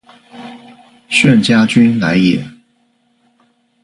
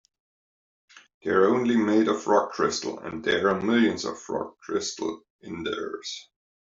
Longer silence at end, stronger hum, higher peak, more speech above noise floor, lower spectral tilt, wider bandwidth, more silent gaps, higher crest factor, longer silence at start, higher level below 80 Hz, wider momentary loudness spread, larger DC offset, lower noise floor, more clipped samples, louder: first, 1.35 s vs 0.45 s; neither; first, 0 dBFS vs -8 dBFS; second, 48 dB vs over 65 dB; about the same, -5.5 dB/octave vs -4.5 dB/octave; first, 11.5 kHz vs 7.8 kHz; second, none vs 1.14-1.21 s, 5.30-5.39 s; second, 14 dB vs 20 dB; second, 0.35 s vs 0.95 s; first, -50 dBFS vs -66 dBFS; first, 24 LU vs 13 LU; neither; second, -58 dBFS vs under -90 dBFS; neither; first, -11 LUFS vs -25 LUFS